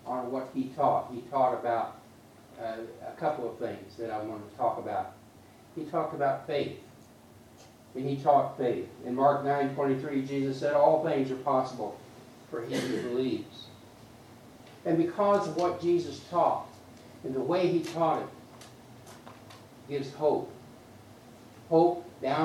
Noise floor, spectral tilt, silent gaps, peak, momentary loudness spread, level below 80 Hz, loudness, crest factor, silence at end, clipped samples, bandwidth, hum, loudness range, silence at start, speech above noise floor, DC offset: -54 dBFS; -6.5 dB/octave; none; -10 dBFS; 23 LU; -72 dBFS; -30 LUFS; 22 dB; 0 s; under 0.1%; 15.5 kHz; none; 8 LU; 0.05 s; 25 dB; under 0.1%